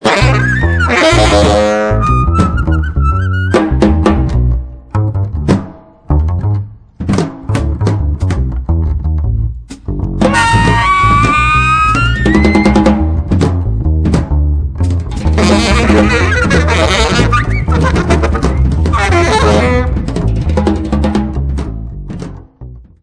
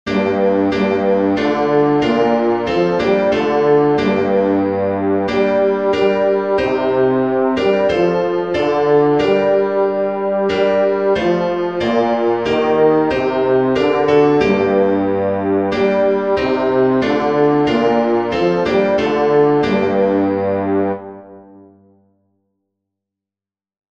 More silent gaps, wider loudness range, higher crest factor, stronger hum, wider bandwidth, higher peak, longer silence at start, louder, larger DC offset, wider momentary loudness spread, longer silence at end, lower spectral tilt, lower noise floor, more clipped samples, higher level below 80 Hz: neither; first, 6 LU vs 2 LU; about the same, 10 dB vs 14 dB; neither; first, 10.5 kHz vs 7.6 kHz; about the same, 0 dBFS vs -2 dBFS; about the same, 0 s vs 0.05 s; first, -12 LUFS vs -15 LUFS; second, under 0.1% vs 0.4%; first, 9 LU vs 4 LU; second, 0.2 s vs 2.5 s; about the same, -6 dB/octave vs -7 dB/octave; second, -31 dBFS vs under -90 dBFS; neither; first, -16 dBFS vs -48 dBFS